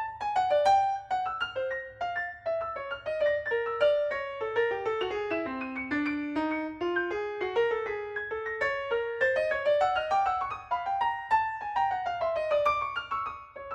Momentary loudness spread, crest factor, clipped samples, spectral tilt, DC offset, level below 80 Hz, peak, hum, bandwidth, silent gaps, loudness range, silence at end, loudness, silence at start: 8 LU; 16 dB; under 0.1%; -4.5 dB/octave; under 0.1%; -60 dBFS; -12 dBFS; none; 9.4 kHz; none; 3 LU; 0 s; -29 LUFS; 0 s